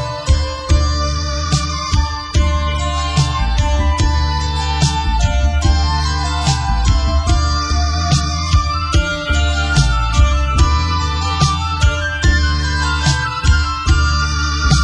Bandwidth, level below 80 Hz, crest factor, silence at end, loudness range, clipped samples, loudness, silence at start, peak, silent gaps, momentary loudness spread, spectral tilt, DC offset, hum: 10.5 kHz; -16 dBFS; 14 dB; 0 s; 2 LU; under 0.1%; -16 LUFS; 0 s; 0 dBFS; none; 3 LU; -4.5 dB/octave; under 0.1%; none